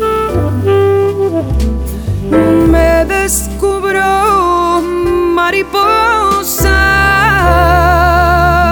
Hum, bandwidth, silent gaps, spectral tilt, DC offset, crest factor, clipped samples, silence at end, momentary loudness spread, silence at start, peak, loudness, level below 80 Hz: none; over 20 kHz; none; -5 dB/octave; under 0.1%; 10 dB; under 0.1%; 0 s; 6 LU; 0 s; 0 dBFS; -10 LUFS; -20 dBFS